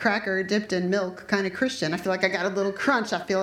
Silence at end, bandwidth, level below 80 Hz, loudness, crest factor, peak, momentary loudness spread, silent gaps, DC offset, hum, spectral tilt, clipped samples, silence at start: 0 s; 15.5 kHz; -64 dBFS; -25 LUFS; 18 dB; -8 dBFS; 3 LU; none; under 0.1%; none; -4.5 dB/octave; under 0.1%; 0 s